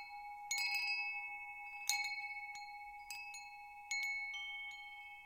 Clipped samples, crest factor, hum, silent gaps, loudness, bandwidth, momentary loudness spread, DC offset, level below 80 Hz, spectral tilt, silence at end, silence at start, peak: under 0.1%; 28 dB; none; none; -41 LUFS; 16.5 kHz; 14 LU; under 0.1%; -78 dBFS; 4.5 dB/octave; 0 s; 0 s; -16 dBFS